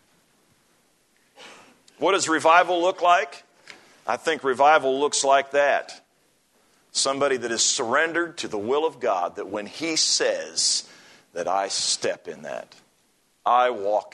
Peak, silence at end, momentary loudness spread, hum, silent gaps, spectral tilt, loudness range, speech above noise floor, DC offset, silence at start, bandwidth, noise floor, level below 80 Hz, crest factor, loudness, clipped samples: -4 dBFS; 0.05 s; 14 LU; none; none; -1 dB/octave; 4 LU; 43 dB; under 0.1%; 1.4 s; 12 kHz; -65 dBFS; -76 dBFS; 20 dB; -22 LUFS; under 0.1%